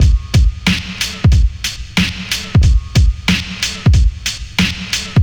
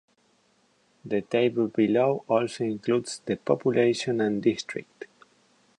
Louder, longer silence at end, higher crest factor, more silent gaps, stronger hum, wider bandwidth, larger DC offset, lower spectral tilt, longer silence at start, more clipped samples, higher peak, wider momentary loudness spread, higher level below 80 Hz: first, -15 LUFS vs -26 LUFS; second, 0 s vs 0.75 s; about the same, 14 dB vs 18 dB; neither; neither; first, over 20 kHz vs 10.5 kHz; neither; about the same, -4.5 dB/octave vs -5.5 dB/octave; second, 0 s vs 1.05 s; neither; first, 0 dBFS vs -8 dBFS; second, 6 LU vs 13 LU; first, -16 dBFS vs -70 dBFS